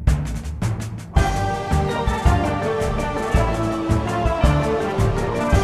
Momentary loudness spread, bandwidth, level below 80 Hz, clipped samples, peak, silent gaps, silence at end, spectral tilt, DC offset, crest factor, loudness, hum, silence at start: 6 LU; 13.5 kHz; -24 dBFS; under 0.1%; -2 dBFS; none; 0 s; -6.5 dB/octave; 0.3%; 18 dB; -21 LUFS; none; 0 s